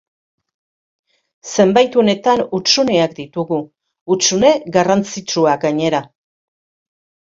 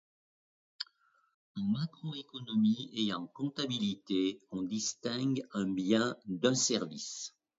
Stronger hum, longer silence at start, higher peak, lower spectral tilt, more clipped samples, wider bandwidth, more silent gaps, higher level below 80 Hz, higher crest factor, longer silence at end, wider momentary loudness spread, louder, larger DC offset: neither; first, 1.45 s vs 0.8 s; first, 0 dBFS vs -12 dBFS; about the same, -4 dB/octave vs -4 dB/octave; neither; about the same, 7.8 kHz vs 7.8 kHz; second, 4.01-4.06 s vs 1.34-1.55 s; first, -56 dBFS vs -74 dBFS; about the same, 18 dB vs 22 dB; first, 1.25 s vs 0.3 s; second, 10 LU vs 13 LU; first, -15 LUFS vs -34 LUFS; neither